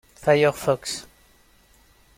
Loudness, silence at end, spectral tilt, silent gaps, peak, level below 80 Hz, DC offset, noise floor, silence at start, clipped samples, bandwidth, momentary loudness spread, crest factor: -22 LUFS; 1.15 s; -4.5 dB/octave; none; -6 dBFS; -56 dBFS; under 0.1%; -57 dBFS; 0.2 s; under 0.1%; 16.5 kHz; 13 LU; 18 dB